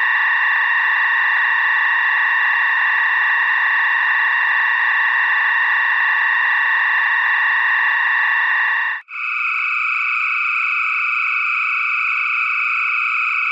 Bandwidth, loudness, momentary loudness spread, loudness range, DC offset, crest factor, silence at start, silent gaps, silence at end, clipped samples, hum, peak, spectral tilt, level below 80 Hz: 7.8 kHz; -15 LUFS; 2 LU; 2 LU; under 0.1%; 12 dB; 0 s; none; 0 s; under 0.1%; none; -6 dBFS; 7.5 dB/octave; under -90 dBFS